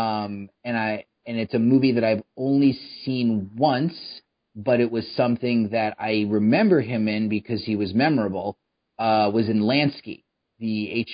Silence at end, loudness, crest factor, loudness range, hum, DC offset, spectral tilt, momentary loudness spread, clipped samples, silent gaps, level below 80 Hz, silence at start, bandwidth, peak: 0 s; -23 LUFS; 16 dB; 2 LU; none; under 0.1%; -11.5 dB/octave; 13 LU; under 0.1%; none; -58 dBFS; 0 s; 5.2 kHz; -6 dBFS